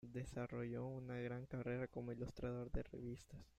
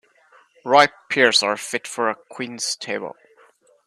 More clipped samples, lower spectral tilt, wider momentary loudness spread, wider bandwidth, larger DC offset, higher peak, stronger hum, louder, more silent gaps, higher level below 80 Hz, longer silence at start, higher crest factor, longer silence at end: neither; first, -8 dB/octave vs -1.5 dB/octave; second, 5 LU vs 15 LU; second, 9.2 kHz vs 13.5 kHz; neither; second, -30 dBFS vs 0 dBFS; neither; second, -48 LUFS vs -20 LUFS; neither; first, -60 dBFS vs -68 dBFS; second, 0 s vs 0.65 s; about the same, 18 dB vs 22 dB; second, 0.1 s vs 0.75 s